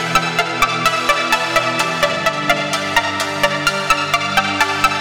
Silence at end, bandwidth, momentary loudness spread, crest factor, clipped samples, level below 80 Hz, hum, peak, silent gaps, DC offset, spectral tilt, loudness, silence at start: 0 s; over 20 kHz; 2 LU; 16 dB; under 0.1%; -42 dBFS; none; 0 dBFS; none; 0.3%; -2.5 dB/octave; -16 LUFS; 0 s